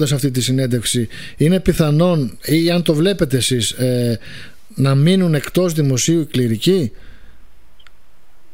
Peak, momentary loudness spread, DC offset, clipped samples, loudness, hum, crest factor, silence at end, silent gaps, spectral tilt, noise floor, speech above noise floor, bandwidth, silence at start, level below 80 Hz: -2 dBFS; 7 LU; 2%; under 0.1%; -16 LUFS; none; 16 dB; 1.45 s; none; -5.5 dB/octave; -50 dBFS; 34 dB; 16.5 kHz; 0 s; -40 dBFS